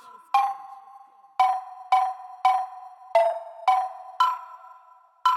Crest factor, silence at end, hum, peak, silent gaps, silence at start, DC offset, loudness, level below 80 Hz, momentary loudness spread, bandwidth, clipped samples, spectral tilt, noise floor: 18 dB; 0 s; none; -8 dBFS; none; 0.35 s; under 0.1%; -25 LUFS; under -90 dBFS; 15 LU; 15 kHz; under 0.1%; 1 dB/octave; -54 dBFS